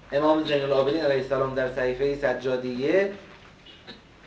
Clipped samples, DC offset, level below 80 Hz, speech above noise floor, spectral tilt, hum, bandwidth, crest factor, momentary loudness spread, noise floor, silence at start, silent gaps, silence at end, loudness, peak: under 0.1%; under 0.1%; -52 dBFS; 25 dB; -6.5 dB/octave; none; 8 kHz; 16 dB; 15 LU; -49 dBFS; 0.1 s; none; 0.3 s; -25 LUFS; -10 dBFS